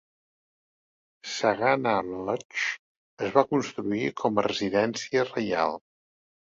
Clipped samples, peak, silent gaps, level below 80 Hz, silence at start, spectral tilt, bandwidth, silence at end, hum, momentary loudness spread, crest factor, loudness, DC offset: under 0.1%; -4 dBFS; 2.45-2.49 s, 2.79-3.17 s; -66 dBFS; 1.25 s; -4.5 dB/octave; 7.8 kHz; 0.8 s; none; 9 LU; 24 dB; -27 LUFS; under 0.1%